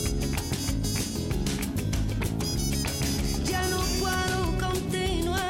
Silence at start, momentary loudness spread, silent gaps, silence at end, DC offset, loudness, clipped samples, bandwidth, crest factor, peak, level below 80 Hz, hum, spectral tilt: 0 s; 3 LU; none; 0 s; under 0.1%; -28 LUFS; under 0.1%; 17 kHz; 12 dB; -16 dBFS; -34 dBFS; none; -4.5 dB/octave